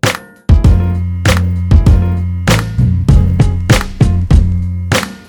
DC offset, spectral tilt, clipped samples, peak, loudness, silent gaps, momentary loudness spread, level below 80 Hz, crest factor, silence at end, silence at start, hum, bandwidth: under 0.1%; -6 dB/octave; 0.8%; 0 dBFS; -12 LUFS; none; 6 LU; -14 dBFS; 10 dB; 0.1 s; 0.05 s; none; 18 kHz